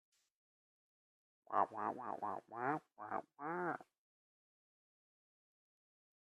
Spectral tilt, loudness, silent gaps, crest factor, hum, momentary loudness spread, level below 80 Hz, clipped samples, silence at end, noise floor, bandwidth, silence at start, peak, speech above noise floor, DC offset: -7.5 dB/octave; -43 LUFS; none; 26 dB; none; 8 LU; under -90 dBFS; under 0.1%; 2.4 s; under -90 dBFS; 12 kHz; 1.5 s; -20 dBFS; over 47 dB; under 0.1%